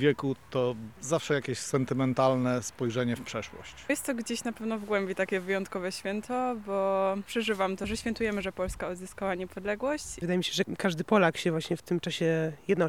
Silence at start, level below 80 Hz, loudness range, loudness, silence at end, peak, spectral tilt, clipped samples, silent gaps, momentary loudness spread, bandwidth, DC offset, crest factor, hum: 0 s; -54 dBFS; 3 LU; -30 LUFS; 0 s; -10 dBFS; -5 dB/octave; under 0.1%; none; 8 LU; 18.5 kHz; 0.1%; 20 dB; none